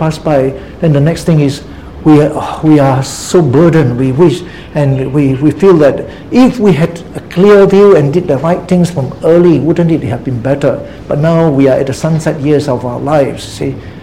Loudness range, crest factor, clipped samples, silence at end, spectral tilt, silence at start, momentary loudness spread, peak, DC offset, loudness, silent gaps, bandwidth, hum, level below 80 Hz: 3 LU; 8 dB; 1%; 0 s; -7.5 dB/octave; 0 s; 10 LU; 0 dBFS; 0.8%; -10 LUFS; none; 14.5 kHz; none; -36 dBFS